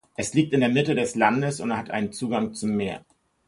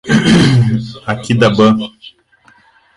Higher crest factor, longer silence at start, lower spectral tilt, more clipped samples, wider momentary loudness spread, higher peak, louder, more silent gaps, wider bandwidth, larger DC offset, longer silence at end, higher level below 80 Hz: first, 20 dB vs 12 dB; first, 0.2 s vs 0.05 s; about the same, -5.5 dB/octave vs -6 dB/octave; neither; second, 7 LU vs 12 LU; second, -6 dBFS vs 0 dBFS; second, -24 LUFS vs -12 LUFS; neither; about the same, 11.5 kHz vs 11.5 kHz; neither; second, 0.5 s vs 1.1 s; second, -58 dBFS vs -40 dBFS